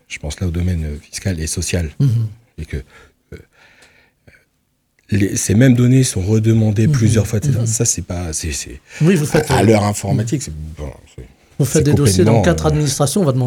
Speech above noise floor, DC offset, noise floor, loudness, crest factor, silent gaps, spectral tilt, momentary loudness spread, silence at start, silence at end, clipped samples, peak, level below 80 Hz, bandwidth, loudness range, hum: 49 dB; under 0.1%; -65 dBFS; -16 LUFS; 16 dB; none; -5.5 dB/octave; 16 LU; 0.1 s; 0 s; under 0.1%; 0 dBFS; -34 dBFS; 17.5 kHz; 9 LU; none